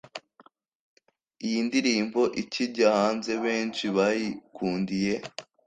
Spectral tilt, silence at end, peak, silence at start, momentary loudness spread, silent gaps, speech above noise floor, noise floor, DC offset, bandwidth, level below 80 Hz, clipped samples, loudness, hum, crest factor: -4.5 dB/octave; 0.25 s; -8 dBFS; 0.05 s; 11 LU; 0.68-0.97 s; 33 dB; -60 dBFS; under 0.1%; 9.4 kHz; -66 dBFS; under 0.1%; -27 LUFS; none; 20 dB